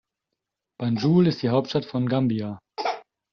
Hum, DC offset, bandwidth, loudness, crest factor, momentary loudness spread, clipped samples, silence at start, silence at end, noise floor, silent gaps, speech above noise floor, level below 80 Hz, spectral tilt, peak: none; under 0.1%; 6.6 kHz; -24 LUFS; 16 dB; 11 LU; under 0.1%; 0.8 s; 0.3 s; -84 dBFS; none; 61 dB; -62 dBFS; -6.5 dB/octave; -8 dBFS